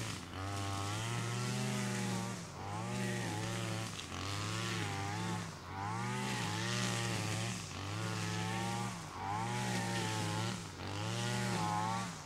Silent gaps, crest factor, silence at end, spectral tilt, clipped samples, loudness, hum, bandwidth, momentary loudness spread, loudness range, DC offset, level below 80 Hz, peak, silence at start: none; 16 dB; 0 s; -4 dB/octave; under 0.1%; -38 LUFS; none; 16 kHz; 6 LU; 2 LU; under 0.1%; -64 dBFS; -22 dBFS; 0 s